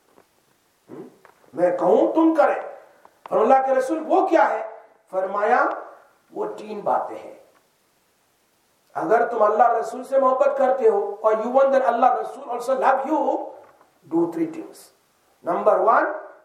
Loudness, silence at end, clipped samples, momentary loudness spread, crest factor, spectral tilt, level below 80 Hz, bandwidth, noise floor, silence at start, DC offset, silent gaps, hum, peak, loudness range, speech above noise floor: -21 LUFS; 0.1 s; under 0.1%; 17 LU; 18 dB; -6 dB/octave; -84 dBFS; 13 kHz; -64 dBFS; 0.9 s; under 0.1%; none; none; -4 dBFS; 6 LU; 44 dB